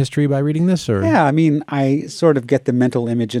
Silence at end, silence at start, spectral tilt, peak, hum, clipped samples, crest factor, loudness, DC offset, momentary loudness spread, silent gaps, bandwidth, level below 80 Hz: 0 s; 0 s; -7 dB/octave; -2 dBFS; none; under 0.1%; 14 dB; -17 LUFS; under 0.1%; 4 LU; none; 12.5 kHz; -58 dBFS